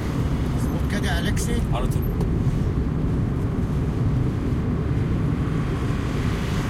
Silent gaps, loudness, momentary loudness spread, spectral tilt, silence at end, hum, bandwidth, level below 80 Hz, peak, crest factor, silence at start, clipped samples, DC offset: none; -24 LUFS; 2 LU; -7 dB/octave; 0 s; none; 15.5 kHz; -28 dBFS; -10 dBFS; 12 dB; 0 s; under 0.1%; under 0.1%